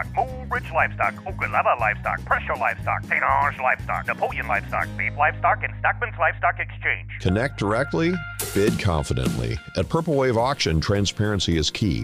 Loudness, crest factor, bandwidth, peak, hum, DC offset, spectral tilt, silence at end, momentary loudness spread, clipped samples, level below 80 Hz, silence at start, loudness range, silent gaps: -23 LUFS; 18 dB; 15.5 kHz; -6 dBFS; none; under 0.1%; -5 dB/octave; 0 s; 6 LU; under 0.1%; -38 dBFS; 0 s; 1 LU; none